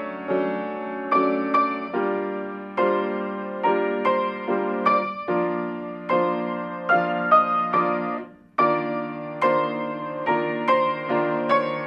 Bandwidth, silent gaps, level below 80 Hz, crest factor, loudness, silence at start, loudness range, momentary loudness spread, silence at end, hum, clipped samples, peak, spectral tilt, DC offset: 6.8 kHz; none; -70 dBFS; 18 dB; -23 LUFS; 0 s; 2 LU; 9 LU; 0 s; none; under 0.1%; -6 dBFS; -8 dB/octave; under 0.1%